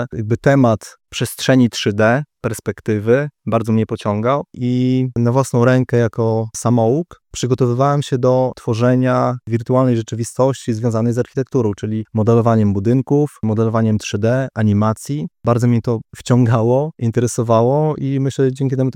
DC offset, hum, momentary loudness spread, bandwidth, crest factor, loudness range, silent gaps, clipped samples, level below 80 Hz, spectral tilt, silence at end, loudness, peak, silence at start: under 0.1%; none; 7 LU; 15 kHz; 14 dB; 1 LU; none; under 0.1%; -52 dBFS; -7 dB/octave; 0.05 s; -17 LUFS; 0 dBFS; 0 s